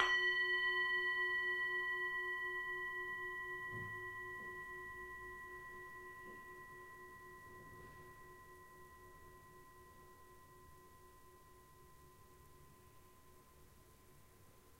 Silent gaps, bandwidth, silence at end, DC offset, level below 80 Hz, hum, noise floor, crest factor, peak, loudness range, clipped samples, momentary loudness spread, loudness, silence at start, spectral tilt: none; 16 kHz; 0 s; under 0.1%; -70 dBFS; none; -64 dBFS; 28 dB; -16 dBFS; 25 LU; under 0.1%; 27 LU; -40 LUFS; 0 s; -3 dB/octave